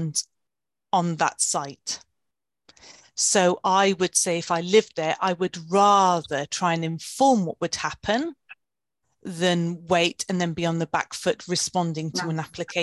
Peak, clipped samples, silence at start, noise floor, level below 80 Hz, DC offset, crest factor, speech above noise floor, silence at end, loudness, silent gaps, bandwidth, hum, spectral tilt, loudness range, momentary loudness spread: -6 dBFS; under 0.1%; 0 s; -87 dBFS; -62 dBFS; under 0.1%; 18 dB; 64 dB; 0 s; -23 LUFS; none; 12.5 kHz; none; -3.5 dB/octave; 5 LU; 10 LU